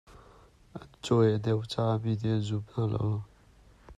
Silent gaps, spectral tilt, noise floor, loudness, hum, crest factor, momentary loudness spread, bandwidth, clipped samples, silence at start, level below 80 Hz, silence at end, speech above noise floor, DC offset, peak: none; -7.5 dB/octave; -58 dBFS; -29 LUFS; none; 18 dB; 23 LU; 9.8 kHz; under 0.1%; 0.1 s; -58 dBFS; 0.05 s; 30 dB; under 0.1%; -14 dBFS